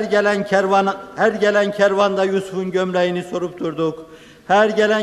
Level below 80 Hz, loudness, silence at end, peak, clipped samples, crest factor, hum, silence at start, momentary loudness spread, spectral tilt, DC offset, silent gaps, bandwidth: -60 dBFS; -18 LUFS; 0 s; -2 dBFS; under 0.1%; 16 dB; none; 0 s; 8 LU; -5.5 dB/octave; under 0.1%; none; 12.5 kHz